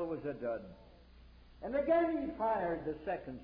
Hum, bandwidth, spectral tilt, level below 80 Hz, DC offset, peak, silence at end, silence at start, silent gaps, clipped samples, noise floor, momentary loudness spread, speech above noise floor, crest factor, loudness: none; 5.2 kHz; -6 dB/octave; -60 dBFS; under 0.1%; -20 dBFS; 0 s; 0 s; none; under 0.1%; -58 dBFS; 12 LU; 23 dB; 16 dB; -36 LUFS